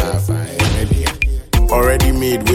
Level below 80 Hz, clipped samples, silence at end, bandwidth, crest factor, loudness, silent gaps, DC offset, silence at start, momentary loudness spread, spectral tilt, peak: -18 dBFS; under 0.1%; 0 s; 17 kHz; 12 dB; -16 LUFS; none; under 0.1%; 0 s; 5 LU; -5 dB/octave; -2 dBFS